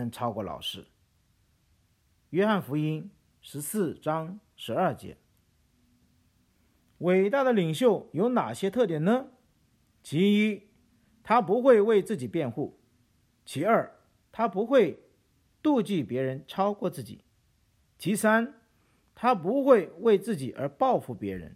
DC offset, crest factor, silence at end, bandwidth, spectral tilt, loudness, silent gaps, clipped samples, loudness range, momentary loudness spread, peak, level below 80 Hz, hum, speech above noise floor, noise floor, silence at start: under 0.1%; 22 dB; 0.05 s; 16 kHz; -6 dB/octave; -27 LUFS; none; under 0.1%; 7 LU; 15 LU; -8 dBFS; -68 dBFS; none; 42 dB; -68 dBFS; 0 s